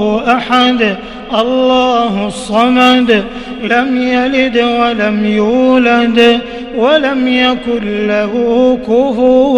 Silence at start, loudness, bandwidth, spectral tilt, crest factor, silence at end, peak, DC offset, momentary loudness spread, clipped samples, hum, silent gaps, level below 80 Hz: 0 s; -11 LUFS; 11 kHz; -5 dB/octave; 10 dB; 0 s; 0 dBFS; under 0.1%; 7 LU; under 0.1%; none; none; -38 dBFS